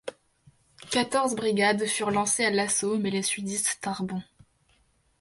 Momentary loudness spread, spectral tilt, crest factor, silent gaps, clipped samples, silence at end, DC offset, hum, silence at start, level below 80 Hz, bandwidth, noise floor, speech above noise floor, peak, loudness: 8 LU; -3 dB/octave; 18 dB; none; under 0.1%; 0.95 s; under 0.1%; none; 0.05 s; -66 dBFS; 12 kHz; -66 dBFS; 40 dB; -10 dBFS; -26 LUFS